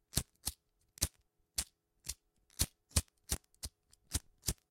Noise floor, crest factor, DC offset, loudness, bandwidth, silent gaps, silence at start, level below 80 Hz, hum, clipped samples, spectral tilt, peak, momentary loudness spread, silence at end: -73 dBFS; 30 dB; under 0.1%; -40 LUFS; 16.5 kHz; none; 0.15 s; -50 dBFS; none; under 0.1%; -2.5 dB/octave; -12 dBFS; 12 LU; 0.15 s